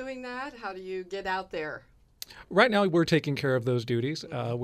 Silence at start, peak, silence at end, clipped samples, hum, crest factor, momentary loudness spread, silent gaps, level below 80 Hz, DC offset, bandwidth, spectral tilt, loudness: 0 s; -6 dBFS; 0 s; under 0.1%; none; 22 dB; 16 LU; none; -62 dBFS; under 0.1%; 15 kHz; -6 dB/octave; -28 LUFS